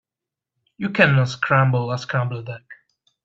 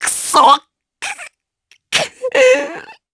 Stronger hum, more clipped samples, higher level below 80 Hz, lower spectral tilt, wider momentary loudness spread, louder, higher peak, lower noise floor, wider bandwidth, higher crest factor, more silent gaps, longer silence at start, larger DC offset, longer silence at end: neither; neither; about the same, -60 dBFS vs -60 dBFS; first, -6.5 dB/octave vs -0.5 dB/octave; about the same, 16 LU vs 17 LU; second, -19 LUFS vs -13 LUFS; about the same, 0 dBFS vs 0 dBFS; first, -87 dBFS vs -56 dBFS; second, 7.6 kHz vs 11 kHz; first, 22 dB vs 16 dB; neither; first, 0.8 s vs 0 s; neither; first, 0.5 s vs 0.2 s